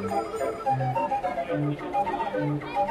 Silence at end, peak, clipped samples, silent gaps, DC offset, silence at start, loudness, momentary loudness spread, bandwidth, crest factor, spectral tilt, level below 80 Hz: 0 s; -14 dBFS; under 0.1%; none; under 0.1%; 0 s; -28 LUFS; 3 LU; 14.5 kHz; 12 dB; -7 dB/octave; -56 dBFS